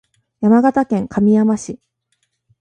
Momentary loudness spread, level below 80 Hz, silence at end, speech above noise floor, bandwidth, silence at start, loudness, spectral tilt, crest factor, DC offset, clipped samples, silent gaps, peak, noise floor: 13 LU; -52 dBFS; 0.85 s; 54 dB; 9.4 kHz; 0.4 s; -15 LUFS; -7.5 dB/octave; 16 dB; under 0.1%; under 0.1%; none; 0 dBFS; -68 dBFS